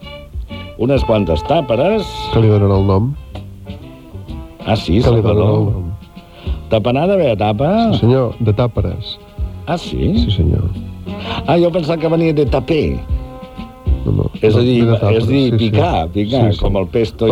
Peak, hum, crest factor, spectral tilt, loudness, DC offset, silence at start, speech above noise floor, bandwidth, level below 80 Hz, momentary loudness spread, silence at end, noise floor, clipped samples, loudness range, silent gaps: 0 dBFS; none; 14 dB; -8.5 dB/octave; -15 LUFS; under 0.1%; 0 s; 23 dB; 10 kHz; -26 dBFS; 17 LU; 0 s; -36 dBFS; under 0.1%; 3 LU; none